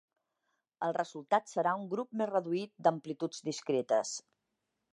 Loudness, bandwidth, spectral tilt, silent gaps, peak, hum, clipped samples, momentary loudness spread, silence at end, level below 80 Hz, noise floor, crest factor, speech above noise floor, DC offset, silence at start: -34 LUFS; 11.5 kHz; -4.5 dB/octave; none; -14 dBFS; none; under 0.1%; 7 LU; 0.7 s; -90 dBFS; -85 dBFS; 22 dB; 51 dB; under 0.1%; 0.8 s